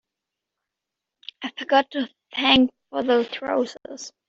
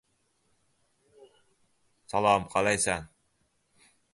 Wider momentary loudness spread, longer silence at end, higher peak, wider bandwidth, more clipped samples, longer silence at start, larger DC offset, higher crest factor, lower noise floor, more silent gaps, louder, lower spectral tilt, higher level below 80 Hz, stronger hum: first, 19 LU vs 8 LU; second, 0.2 s vs 1.05 s; first, -4 dBFS vs -10 dBFS; second, 7.8 kHz vs 11.5 kHz; neither; second, 1.4 s vs 2.1 s; neither; about the same, 20 dB vs 22 dB; first, -85 dBFS vs -73 dBFS; neither; first, -22 LUFS vs -27 LUFS; second, -0.5 dB/octave vs -3 dB/octave; about the same, -58 dBFS vs -58 dBFS; neither